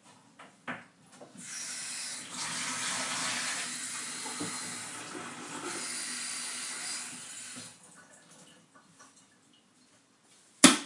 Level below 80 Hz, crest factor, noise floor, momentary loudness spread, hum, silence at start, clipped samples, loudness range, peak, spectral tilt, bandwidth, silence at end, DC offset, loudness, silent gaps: -86 dBFS; 34 dB; -64 dBFS; 22 LU; none; 0.05 s; under 0.1%; 10 LU; -2 dBFS; -1 dB/octave; 11.5 kHz; 0 s; under 0.1%; -33 LUFS; none